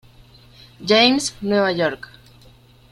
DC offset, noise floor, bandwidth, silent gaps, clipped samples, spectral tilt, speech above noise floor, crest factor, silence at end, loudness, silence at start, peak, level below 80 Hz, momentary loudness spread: under 0.1%; -49 dBFS; 14.5 kHz; none; under 0.1%; -3.5 dB/octave; 31 dB; 20 dB; 0.95 s; -18 LUFS; 0.8 s; -2 dBFS; -54 dBFS; 15 LU